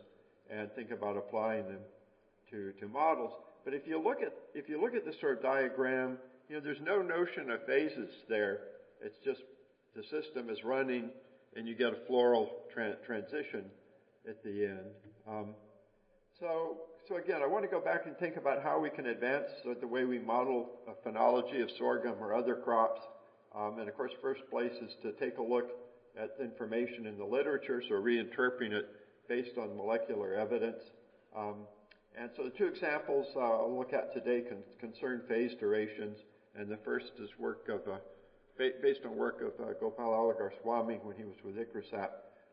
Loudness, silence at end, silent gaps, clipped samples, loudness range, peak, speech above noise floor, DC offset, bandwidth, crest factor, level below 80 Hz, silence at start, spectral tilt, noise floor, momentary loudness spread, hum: -37 LUFS; 0.25 s; none; under 0.1%; 5 LU; -16 dBFS; 34 dB; under 0.1%; 5.2 kHz; 20 dB; -82 dBFS; 0.5 s; -3 dB/octave; -70 dBFS; 15 LU; none